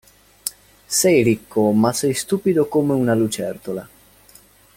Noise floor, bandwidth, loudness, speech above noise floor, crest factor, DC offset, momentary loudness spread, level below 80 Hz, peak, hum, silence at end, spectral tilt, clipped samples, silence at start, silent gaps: -50 dBFS; 17 kHz; -19 LUFS; 32 dB; 20 dB; under 0.1%; 14 LU; -56 dBFS; 0 dBFS; none; 0.9 s; -5 dB/octave; under 0.1%; 0.45 s; none